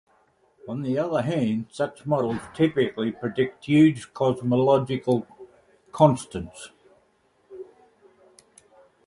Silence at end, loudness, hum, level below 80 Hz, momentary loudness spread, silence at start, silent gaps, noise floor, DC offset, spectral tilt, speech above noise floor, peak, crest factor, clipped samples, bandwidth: 1.45 s; -24 LUFS; none; -58 dBFS; 23 LU; 0.65 s; none; -65 dBFS; under 0.1%; -7 dB/octave; 42 dB; -2 dBFS; 22 dB; under 0.1%; 11.5 kHz